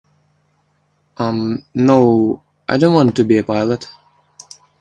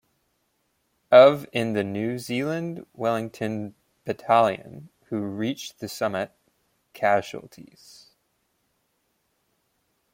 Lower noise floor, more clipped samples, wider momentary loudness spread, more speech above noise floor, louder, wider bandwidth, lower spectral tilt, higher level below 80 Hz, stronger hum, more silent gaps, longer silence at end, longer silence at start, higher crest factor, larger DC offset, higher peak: second, -62 dBFS vs -72 dBFS; neither; second, 12 LU vs 18 LU; about the same, 48 dB vs 49 dB; first, -15 LUFS vs -23 LUFS; second, 9.8 kHz vs 16.5 kHz; first, -7.5 dB/octave vs -5.5 dB/octave; first, -58 dBFS vs -70 dBFS; neither; neither; second, 0.9 s vs 2.5 s; about the same, 1.2 s vs 1.1 s; second, 16 dB vs 22 dB; neither; about the same, 0 dBFS vs -2 dBFS